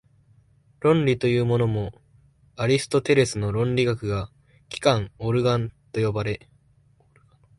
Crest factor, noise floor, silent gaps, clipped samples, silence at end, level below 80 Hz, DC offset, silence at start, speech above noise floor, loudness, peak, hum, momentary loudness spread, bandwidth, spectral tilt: 20 dB; -60 dBFS; none; under 0.1%; 1.2 s; -50 dBFS; under 0.1%; 0.8 s; 37 dB; -23 LUFS; -6 dBFS; none; 10 LU; 11.5 kHz; -6 dB/octave